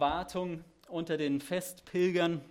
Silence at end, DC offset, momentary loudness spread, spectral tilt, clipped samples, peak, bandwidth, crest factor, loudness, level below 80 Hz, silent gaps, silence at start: 0.05 s; under 0.1%; 11 LU; -5.5 dB/octave; under 0.1%; -16 dBFS; 16.5 kHz; 16 dB; -33 LUFS; -60 dBFS; none; 0 s